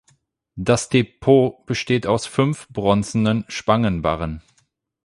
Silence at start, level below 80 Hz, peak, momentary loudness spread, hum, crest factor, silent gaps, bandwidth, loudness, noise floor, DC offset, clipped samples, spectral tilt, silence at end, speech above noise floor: 0.55 s; -44 dBFS; -2 dBFS; 10 LU; none; 18 dB; none; 11.5 kHz; -20 LUFS; -66 dBFS; under 0.1%; under 0.1%; -6 dB/octave; 0.65 s; 46 dB